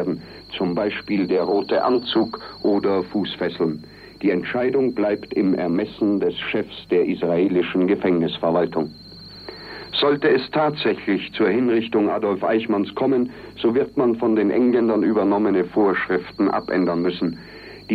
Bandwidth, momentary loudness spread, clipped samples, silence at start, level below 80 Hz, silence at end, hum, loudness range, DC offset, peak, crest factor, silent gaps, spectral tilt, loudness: 5.4 kHz; 8 LU; under 0.1%; 0 s; -56 dBFS; 0 s; none; 3 LU; under 0.1%; -6 dBFS; 14 dB; none; -8 dB/octave; -21 LUFS